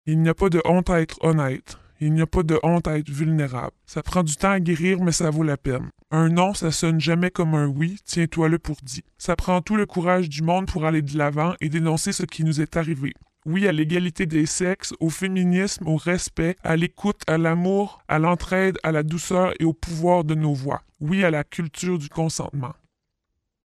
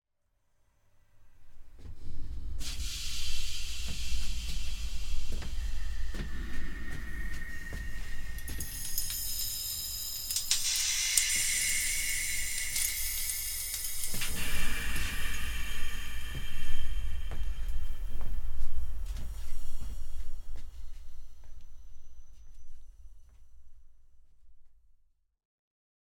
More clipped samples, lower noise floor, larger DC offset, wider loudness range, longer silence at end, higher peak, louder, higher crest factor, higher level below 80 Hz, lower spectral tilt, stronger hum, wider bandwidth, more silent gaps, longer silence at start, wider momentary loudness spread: neither; first, -78 dBFS vs -74 dBFS; neither; second, 2 LU vs 16 LU; second, 0.95 s vs 1.4 s; about the same, -4 dBFS vs -2 dBFS; first, -22 LUFS vs -34 LUFS; second, 18 dB vs 26 dB; second, -42 dBFS vs -36 dBFS; first, -6 dB/octave vs -1 dB/octave; neither; second, 13 kHz vs 17.5 kHz; neither; second, 0.05 s vs 1.2 s; second, 7 LU vs 17 LU